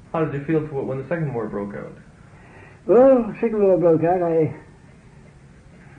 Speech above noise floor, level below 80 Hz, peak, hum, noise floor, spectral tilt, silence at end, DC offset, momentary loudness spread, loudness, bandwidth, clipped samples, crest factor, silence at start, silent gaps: 28 dB; -52 dBFS; -6 dBFS; none; -47 dBFS; -10 dB/octave; 1.35 s; under 0.1%; 18 LU; -20 LUFS; 4.3 kHz; under 0.1%; 16 dB; 0.15 s; none